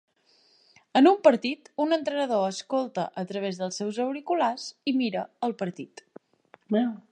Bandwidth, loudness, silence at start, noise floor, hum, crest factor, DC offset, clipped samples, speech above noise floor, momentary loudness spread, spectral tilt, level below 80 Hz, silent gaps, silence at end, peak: 9.8 kHz; -26 LUFS; 0.95 s; -64 dBFS; none; 22 dB; under 0.1%; under 0.1%; 38 dB; 11 LU; -5 dB/octave; -82 dBFS; none; 0.1 s; -4 dBFS